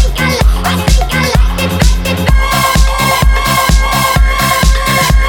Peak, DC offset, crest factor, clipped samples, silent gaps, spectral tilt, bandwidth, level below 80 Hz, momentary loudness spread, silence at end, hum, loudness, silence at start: 0 dBFS; under 0.1%; 10 dB; 0.2%; none; -4 dB/octave; 19 kHz; -12 dBFS; 2 LU; 0 s; none; -11 LUFS; 0 s